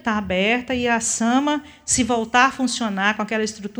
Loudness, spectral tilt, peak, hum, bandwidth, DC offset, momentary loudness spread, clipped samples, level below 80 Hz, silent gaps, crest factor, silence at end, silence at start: -20 LUFS; -3 dB/octave; -2 dBFS; none; over 20 kHz; under 0.1%; 6 LU; under 0.1%; -48 dBFS; none; 20 dB; 0 s; 0.05 s